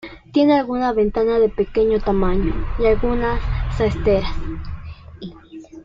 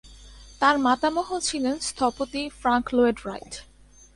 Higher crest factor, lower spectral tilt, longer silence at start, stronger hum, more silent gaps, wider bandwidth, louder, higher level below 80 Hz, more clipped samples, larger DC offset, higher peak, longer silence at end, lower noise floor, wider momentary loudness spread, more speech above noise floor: second, 14 dB vs 20 dB; first, -8 dB/octave vs -3 dB/octave; about the same, 0.05 s vs 0.05 s; second, none vs 50 Hz at -50 dBFS; neither; second, 7.4 kHz vs 11.5 kHz; first, -19 LUFS vs -24 LUFS; first, -28 dBFS vs -50 dBFS; neither; neither; about the same, -4 dBFS vs -4 dBFS; second, 0 s vs 0.5 s; second, -39 dBFS vs -46 dBFS; first, 19 LU vs 14 LU; about the same, 21 dB vs 22 dB